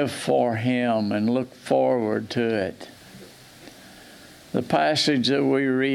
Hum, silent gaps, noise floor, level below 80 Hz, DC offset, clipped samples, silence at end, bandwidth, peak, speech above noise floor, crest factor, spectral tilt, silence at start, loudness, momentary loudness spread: none; none; -47 dBFS; -66 dBFS; under 0.1%; under 0.1%; 0 s; 14.5 kHz; -8 dBFS; 24 dB; 16 dB; -5.5 dB/octave; 0 s; -23 LUFS; 9 LU